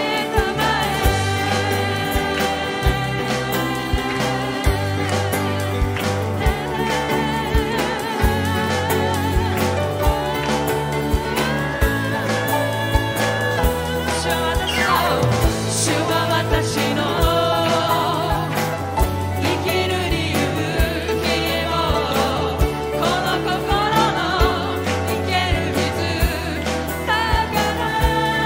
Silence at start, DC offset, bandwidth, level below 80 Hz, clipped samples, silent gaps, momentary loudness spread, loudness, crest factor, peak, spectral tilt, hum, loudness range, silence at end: 0 s; under 0.1%; 16.5 kHz; -28 dBFS; under 0.1%; none; 4 LU; -20 LUFS; 18 dB; -2 dBFS; -4.5 dB/octave; none; 2 LU; 0 s